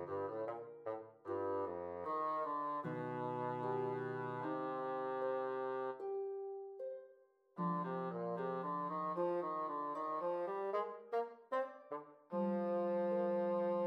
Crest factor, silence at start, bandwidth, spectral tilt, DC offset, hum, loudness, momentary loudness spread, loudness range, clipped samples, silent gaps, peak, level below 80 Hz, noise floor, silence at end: 14 dB; 0 s; 5.6 kHz; -9 dB/octave; under 0.1%; none; -41 LUFS; 10 LU; 3 LU; under 0.1%; none; -28 dBFS; -90 dBFS; -68 dBFS; 0 s